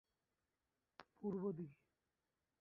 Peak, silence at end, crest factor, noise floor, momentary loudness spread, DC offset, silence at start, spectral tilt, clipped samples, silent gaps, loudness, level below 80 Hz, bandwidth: -32 dBFS; 0.9 s; 20 dB; under -90 dBFS; 22 LU; under 0.1%; 1 s; -9 dB/octave; under 0.1%; none; -48 LUFS; -86 dBFS; 5.6 kHz